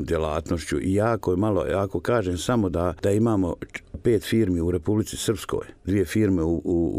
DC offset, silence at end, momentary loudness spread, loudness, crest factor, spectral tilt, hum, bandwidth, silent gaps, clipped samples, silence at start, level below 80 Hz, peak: under 0.1%; 0 s; 6 LU; -24 LUFS; 14 dB; -6.5 dB/octave; none; 15.5 kHz; none; under 0.1%; 0 s; -42 dBFS; -10 dBFS